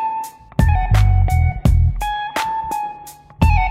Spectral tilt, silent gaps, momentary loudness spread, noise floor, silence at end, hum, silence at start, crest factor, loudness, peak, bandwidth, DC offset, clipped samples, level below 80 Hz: -6.5 dB/octave; none; 11 LU; -38 dBFS; 0 s; none; 0 s; 16 dB; -18 LUFS; 0 dBFS; 15.5 kHz; under 0.1%; under 0.1%; -20 dBFS